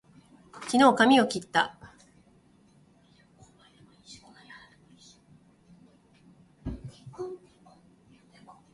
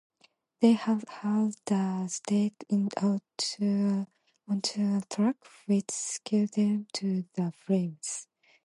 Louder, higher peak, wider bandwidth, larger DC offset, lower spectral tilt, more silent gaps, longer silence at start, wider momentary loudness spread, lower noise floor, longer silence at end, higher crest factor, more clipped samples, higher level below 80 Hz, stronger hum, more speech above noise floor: first, -24 LUFS vs -30 LUFS; about the same, -8 dBFS vs -10 dBFS; about the same, 11.5 kHz vs 11.5 kHz; neither; second, -4 dB/octave vs -5.5 dB/octave; neither; about the same, 0.55 s vs 0.6 s; first, 30 LU vs 7 LU; second, -61 dBFS vs -67 dBFS; first, 1.35 s vs 0.45 s; about the same, 24 dB vs 20 dB; neither; first, -58 dBFS vs -78 dBFS; neither; about the same, 39 dB vs 39 dB